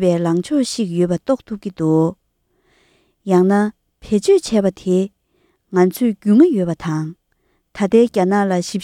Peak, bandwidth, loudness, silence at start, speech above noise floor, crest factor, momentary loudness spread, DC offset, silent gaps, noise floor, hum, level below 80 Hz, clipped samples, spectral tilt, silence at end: 0 dBFS; 14.5 kHz; -17 LUFS; 0 s; 49 dB; 16 dB; 9 LU; under 0.1%; none; -65 dBFS; none; -52 dBFS; under 0.1%; -6.5 dB/octave; 0 s